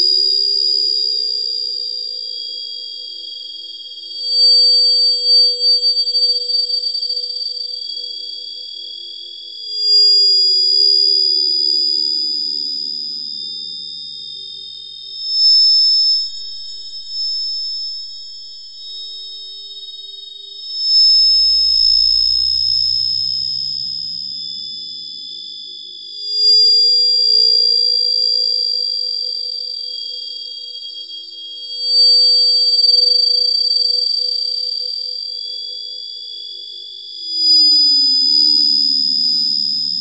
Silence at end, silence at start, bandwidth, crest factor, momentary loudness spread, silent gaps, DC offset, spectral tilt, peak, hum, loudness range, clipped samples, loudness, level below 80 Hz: 0 s; 0 s; 8.2 kHz; 12 dB; 20 LU; none; under 0.1%; -0.5 dB/octave; -4 dBFS; none; 10 LU; under 0.1%; -12 LUFS; -54 dBFS